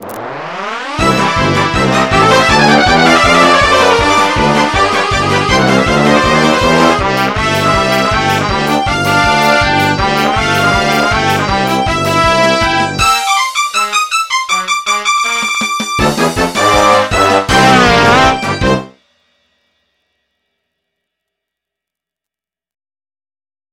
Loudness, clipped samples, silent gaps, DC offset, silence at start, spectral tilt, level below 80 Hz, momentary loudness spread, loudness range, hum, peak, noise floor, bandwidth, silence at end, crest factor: -10 LUFS; under 0.1%; none; 0.5%; 0 s; -4 dB/octave; -30 dBFS; 6 LU; 4 LU; none; 0 dBFS; -87 dBFS; 17.5 kHz; 4.85 s; 12 dB